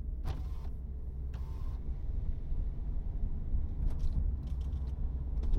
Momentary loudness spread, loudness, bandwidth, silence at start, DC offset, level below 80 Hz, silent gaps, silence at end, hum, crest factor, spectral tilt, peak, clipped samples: 6 LU; -40 LUFS; 5.4 kHz; 0 s; under 0.1%; -34 dBFS; none; 0 s; none; 14 dB; -9 dB/octave; -20 dBFS; under 0.1%